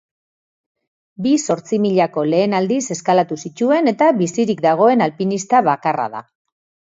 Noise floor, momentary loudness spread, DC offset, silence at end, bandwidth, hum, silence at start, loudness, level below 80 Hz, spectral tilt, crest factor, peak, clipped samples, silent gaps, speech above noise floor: under -90 dBFS; 8 LU; under 0.1%; 0.65 s; 8 kHz; none; 1.2 s; -17 LUFS; -66 dBFS; -5.5 dB/octave; 16 dB; 0 dBFS; under 0.1%; none; over 74 dB